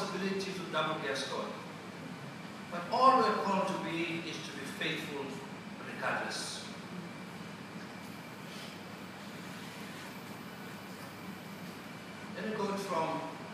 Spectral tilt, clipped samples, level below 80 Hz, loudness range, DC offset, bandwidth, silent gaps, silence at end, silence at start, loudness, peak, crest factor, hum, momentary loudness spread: -4.5 dB/octave; under 0.1%; -76 dBFS; 13 LU; under 0.1%; 15.5 kHz; none; 0 s; 0 s; -37 LUFS; -12 dBFS; 26 dB; none; 13 LU